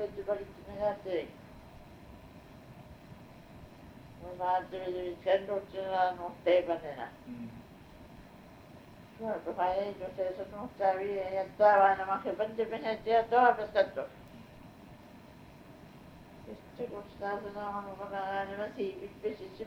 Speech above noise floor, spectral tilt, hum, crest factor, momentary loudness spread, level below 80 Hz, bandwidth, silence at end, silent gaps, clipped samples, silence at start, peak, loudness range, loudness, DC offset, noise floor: 21 dB; -6.5 dB/octave; none; 22 dB; 26 LU; -62 dBFS; 16 kHz; 0 s; none; under 0.1%; 0 s; -12 dBFS; 14 LU; -32 LUFS; under 0.1%; -53 dBFS